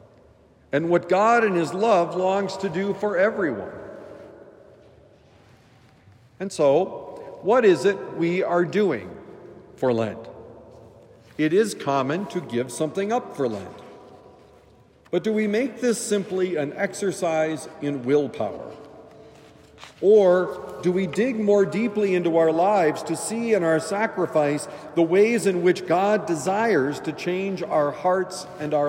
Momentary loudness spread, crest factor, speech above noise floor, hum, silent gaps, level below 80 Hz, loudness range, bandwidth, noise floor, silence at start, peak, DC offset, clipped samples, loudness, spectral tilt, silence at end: 14 LU; 16 dB; 32 dB; none; none; -66 dBFS; 7 LU; 16 kHz; -54 dBFS; 0.75 s; -6 dBFS; under 0.1%; under 0.1%; -23 LUFS; -5.5 dB/octave; 0 s